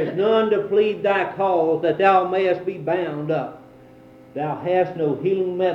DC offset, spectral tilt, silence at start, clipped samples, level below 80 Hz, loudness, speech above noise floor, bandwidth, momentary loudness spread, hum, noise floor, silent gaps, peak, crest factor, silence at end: under 0.1%; -8 dB/octave; 0 s; under 0.1%; -64 dBFS; -21 LUFS; 26 dB; 6 kHz; 9 LU; none; -46 dBFS; none; -4 dBFS; 16 dB; 0 s